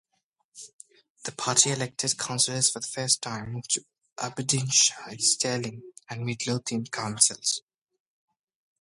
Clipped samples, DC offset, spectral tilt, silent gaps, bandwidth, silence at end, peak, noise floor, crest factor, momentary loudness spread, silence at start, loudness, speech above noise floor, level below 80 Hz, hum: under 0.1%; under 0.1%; -2 dB/octave; 0.73-0.79 s, 1.10-1.15 s; 11.5 kHz; 1.2 s; -4 dBFS; -77 dBFS; 26 dB; 17 LU; 0.55 s; -25 LUFS; 49 dB; -66 dBFS; none